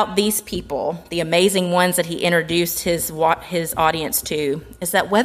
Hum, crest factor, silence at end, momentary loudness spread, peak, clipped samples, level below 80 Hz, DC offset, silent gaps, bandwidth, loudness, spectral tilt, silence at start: none; 16 dB; 0 s; 8 LU; -2 dBFS; under 0.1%; -46 dBFS; under 0.1%; none; 15.5 kHz; -20 LUFS; -3.5 dB/octave; 0 s